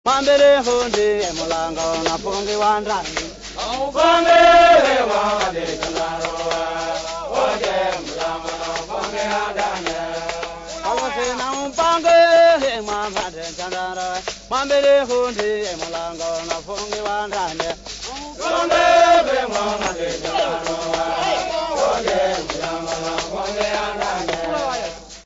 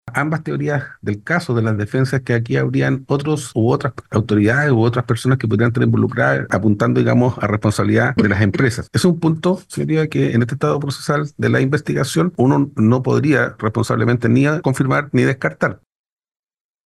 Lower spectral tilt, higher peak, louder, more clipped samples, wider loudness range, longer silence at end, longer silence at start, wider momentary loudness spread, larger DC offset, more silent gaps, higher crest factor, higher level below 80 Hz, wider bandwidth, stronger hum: second, -2.5 dB/octave vs -7 dB/octave; about the same, -4 dBFS vs -2 dBFS; about the same, -19 LUFS vs -17 LUFS; neither; first, 8 LU vs 2 LU; second, 0.05 s vs 1.1 s; about the same, 0.05 s vs 0.05 s; first, 13 LU vs 6 LU; neither; neither; about the same, 16 dB vs 16 dB; first, -44 dBFS vs -50 dBFS; second, 8 kHz vs 12.5 kHz; neither